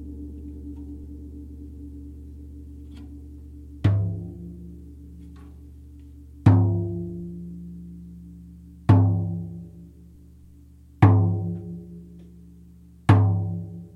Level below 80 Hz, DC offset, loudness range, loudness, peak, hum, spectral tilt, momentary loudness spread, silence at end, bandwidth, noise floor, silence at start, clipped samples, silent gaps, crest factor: -44 dBFS; under 0.1%; 8 LU; -23 LUFS; -2 dBFS; none; -9.5 dB/octave; 26 LU; 0.1 s; 4.4 kHz; -49 dBFS; 0 s; under 0.1%; none; 24 dB